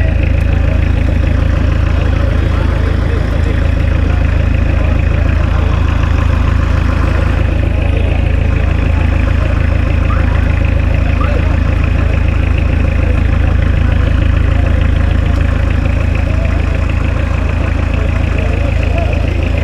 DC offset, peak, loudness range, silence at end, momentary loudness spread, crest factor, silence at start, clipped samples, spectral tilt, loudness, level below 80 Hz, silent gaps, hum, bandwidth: under 0.1%; 0 dBFS; 1 LU; 0 s; 2 LU; 10 dB; 0 s; under 0.1%; -8 dB/octave; -13 LUFS; -14 dBFS; none; none; 7.4 kHz